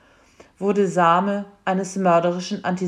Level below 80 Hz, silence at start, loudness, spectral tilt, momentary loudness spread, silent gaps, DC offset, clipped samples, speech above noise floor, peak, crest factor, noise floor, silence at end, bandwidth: -66 dBFS; 0.6 s; -21 LUFS; -6 dB/octave; 9 LU; none; under 0.1%; under 0.1%; 32 dB; -4 dBFS; 18 dB; -52 dBFS; 0 s; 10.5 kHz